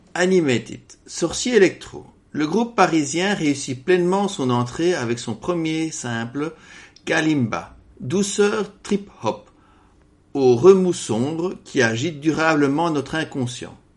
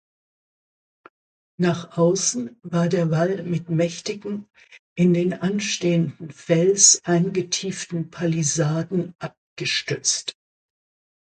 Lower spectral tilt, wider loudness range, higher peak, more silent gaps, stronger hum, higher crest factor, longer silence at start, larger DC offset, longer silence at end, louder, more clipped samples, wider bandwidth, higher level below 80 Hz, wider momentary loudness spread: about the same, -5 dB/octave vs -4 dB/octave; about the same, 5 LU vs 5 LU; about the same, 0 dBFS vs 0 dBFS; second, none vs 4.79-4.96 s, 9.37-9.56 s; neither; about the same, 20 dB vs 22 dB; second, 0.15 s vs 1.6 s; neither; second, 0.2 s vs 0.95 s; about the same, -20 LUFS vs -21 LUFS; neither; first, 11.5 kHz vs 9.6 kHz; first, -54 dBFS vs -64 dBFS; about the same, 13 LU vs 12 LU